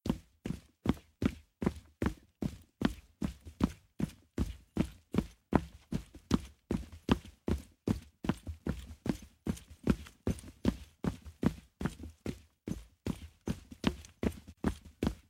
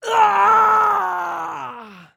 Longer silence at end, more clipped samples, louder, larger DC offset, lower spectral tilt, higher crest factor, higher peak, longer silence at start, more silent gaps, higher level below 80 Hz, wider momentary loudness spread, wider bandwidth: second, 0.1 s vs 0.25 s; neither; second, -38 LUFS vs -16 LUFS; neither; first, -7 dB/octave vs -2.5 dB/octave; first, 28 dB vs 14 dB; second, -10 dBFS vs -2 dBFS; about the same, 0.05 s vs 0.05 s; neither; first, -46 dBFS vs -68 dBFS; second, 8 LU vs 16 LU; second, 16.5 kHz vs over 20 kHz